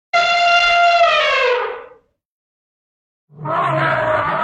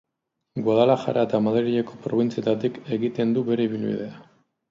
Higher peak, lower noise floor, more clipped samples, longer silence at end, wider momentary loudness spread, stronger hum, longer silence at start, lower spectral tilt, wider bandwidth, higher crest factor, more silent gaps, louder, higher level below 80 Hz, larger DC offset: about the same, -4 dBFS vs -6 dBFS; second, -48 dBFS vs -80 dBFS; neither; second, 0 s vs 0.5 s; first, 12 LU vs 8 LU; neither; second, 0.15 s vs 0.55 s; second, -3.5 dB/octave vs -8 dB/octave; first, 8.8 kHz vs 7.4 kHz; second, 12 dB vs 18 dB; first, 2.25-3.28 s vs none; first, -14 LUFS vs -23 LUFS; first, -52 dBFS vs -68 dBFS; neither